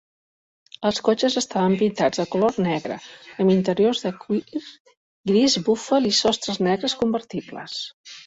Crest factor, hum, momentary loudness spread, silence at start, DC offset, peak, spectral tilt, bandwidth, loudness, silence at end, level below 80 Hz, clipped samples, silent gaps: 18 dB; none; 13 LU; 0.8 s; under 0.1%; -6 dBFS; -4.5 dB/octave; 8 kHz; -22 LUFS; 0.05 s; -60 dBFS; under 0.1%; 4.80-4.85 s, 4.97-5.23 s, 7.94-8.04 s